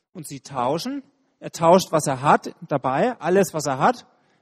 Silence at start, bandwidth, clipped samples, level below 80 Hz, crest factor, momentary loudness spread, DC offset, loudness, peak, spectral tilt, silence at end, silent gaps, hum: 0.15 s; 15 kHz; under 0.1%; -62 dBFS; 20 dB; 18 LU; under 0.1%; -21 LUFS; -2 dBFS; -5 dB/octave; 0.4 s; none; none